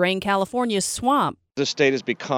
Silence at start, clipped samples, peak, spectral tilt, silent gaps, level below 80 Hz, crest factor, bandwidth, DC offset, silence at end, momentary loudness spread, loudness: 0 s; under 0.1%; -6 dBFS; -3.5 dB/octave; none; -56 dBFS; 16 dB; 19.5 kHz; under 0.1%; 0 s; 6 LU; -22 LUFS